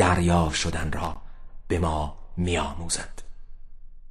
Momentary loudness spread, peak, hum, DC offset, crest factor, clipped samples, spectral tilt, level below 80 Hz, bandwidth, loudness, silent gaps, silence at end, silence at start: 12 LU; -6 dBFS; none; 0.1%; 20 dB; under 0.1%; -4.5 dB/octave; -36 dBFS; 12.5 kHz; -26 LUFS; none; 0 s; 0 s